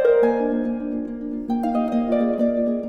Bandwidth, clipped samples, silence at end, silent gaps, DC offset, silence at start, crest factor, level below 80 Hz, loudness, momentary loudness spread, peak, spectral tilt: 5 kHz; under 0.1%; 0 s; none; under 0.1%; 0 s; 14 dB; -50 dBFS; -22 LUFS; 10 LU; -6 dBFS; -8 dB/octave